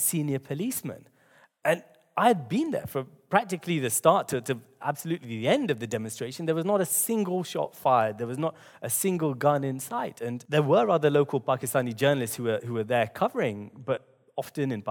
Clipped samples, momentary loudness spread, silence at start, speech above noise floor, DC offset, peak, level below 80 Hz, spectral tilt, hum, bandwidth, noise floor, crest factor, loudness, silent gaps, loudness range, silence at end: under 0.1%; 10 LU; 0 s; 34 dB; under 0.1%; -6 dBFS; -72 dBFS; -4.5 dB/octave; none; 19 kHz; -61 dBFS; 22 dB; -27 LUFS; none; 3 LU; 0 s